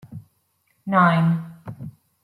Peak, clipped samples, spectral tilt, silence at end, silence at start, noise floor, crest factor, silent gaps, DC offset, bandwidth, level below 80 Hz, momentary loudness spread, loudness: -4 dBFS; under 0.1%; -8.5 dB/octave; 0.35 s; 0.1 s; -68 dBFS; 20 dB; none; under 0.1%; 4.5 kHz; -62 dBFS; 24 LU; -19 LUFS